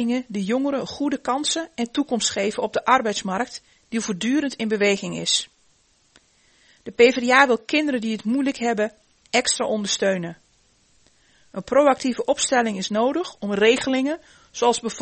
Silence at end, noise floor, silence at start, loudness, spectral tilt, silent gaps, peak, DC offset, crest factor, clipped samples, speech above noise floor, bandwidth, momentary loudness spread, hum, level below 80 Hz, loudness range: 0 s; -61 dBFS; 0 s; -21 LUFS; -3 dB/octave; none; -2 dBFS; under 0.1%; 22 dB; under 0.1%; 39 dB; 8.8 kHz; 10 LU; none; -62 dBFS; 4 LU